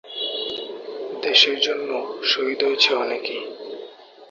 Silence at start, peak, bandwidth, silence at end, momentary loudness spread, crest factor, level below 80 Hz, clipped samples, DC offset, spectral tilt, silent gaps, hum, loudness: 0.05 s; 0 dBFS; 7.6 kHz; 0.05 s; 18 LU; 22 dB; -74 dBFS; under 0.1%; under 0.1%; -1 dB/octave; none; none; -20 LUFS